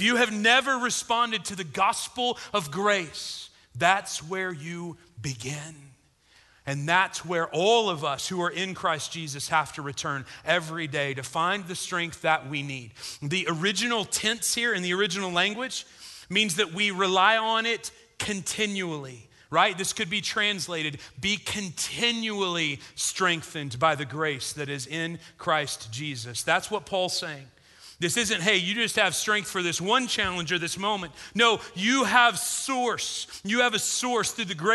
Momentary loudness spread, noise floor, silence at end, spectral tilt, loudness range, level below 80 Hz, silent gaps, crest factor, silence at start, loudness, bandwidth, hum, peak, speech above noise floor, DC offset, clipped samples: 12 LU; -60 dBFS; 0 s; -2.5 dB/octave; 5 LU; -62 dBFS; none; 22 dB; 0 s; -26 LUFS; 12.5 kHz; none; -4 dBFS; 34 dB; under 0.1%; under 0.1%